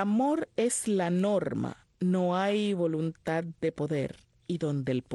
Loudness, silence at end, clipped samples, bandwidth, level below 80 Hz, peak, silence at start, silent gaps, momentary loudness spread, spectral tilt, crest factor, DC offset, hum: -30 LUFS; 0 s; under 0.1%; 12.5 kHz; -66 dBFS; -16 dBFS; 0 s; none; 7 LU; -6 dB/octave; 14 dB; under 0.1%; none